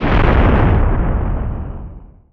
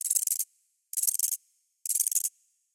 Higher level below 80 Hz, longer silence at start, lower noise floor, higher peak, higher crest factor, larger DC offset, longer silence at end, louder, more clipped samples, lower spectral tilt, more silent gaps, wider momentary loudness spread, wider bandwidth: first, -18 dBFS vs under -90 dBFS; about the same, 0 s vs 0 s; second, -34 dBFS vs -59 dBFS; first, 0 dBFS vs -8 dBFS; second, 14 dB vs 24 dB; neither; second, 0.25 s vs 0.45 s; first, -16 LUFS vs -28 LUFS; neither; first, -9.5 dB/octave vs 9 dB/octave; neither; first, 17 LU vs 10 LU; second, 5.2 kHz vs 17 kHz